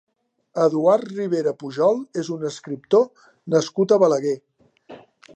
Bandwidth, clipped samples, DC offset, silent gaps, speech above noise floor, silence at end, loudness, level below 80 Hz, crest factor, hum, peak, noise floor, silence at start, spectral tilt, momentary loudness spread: 8.8 kHz; under 0.1%; under 0.1%; none; 26 dB; 0.4 s; -21 LUFS; -76 dBFS; 18 dB; none; -4 dBFS; -46 dBFS; 0.55 s; -6 dB/octave; 12 LU